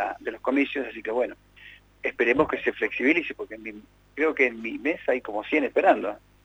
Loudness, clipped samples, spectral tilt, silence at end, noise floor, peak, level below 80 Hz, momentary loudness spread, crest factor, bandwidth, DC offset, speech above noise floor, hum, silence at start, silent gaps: -25 LUFS; under 0.1%; -6 dB/octave; 0.25 s; -50 dBFS; -6 dBFS; -60 dBFS; 12 LU; 20 dB; 8.8 kHz; under 0.1%; 25 dB; 50 Hz at -60 dBFS; 0 s; none